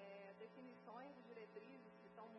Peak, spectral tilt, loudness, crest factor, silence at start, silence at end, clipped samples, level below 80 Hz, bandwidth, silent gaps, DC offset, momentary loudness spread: -44 dBFS; -4.5 dB/octave; -60 LUFS; 14 dB; 0 s; 0 s; under 0.1%; under -90 dBFS; 5.6 kHz; none; under 0.1%; 4 LU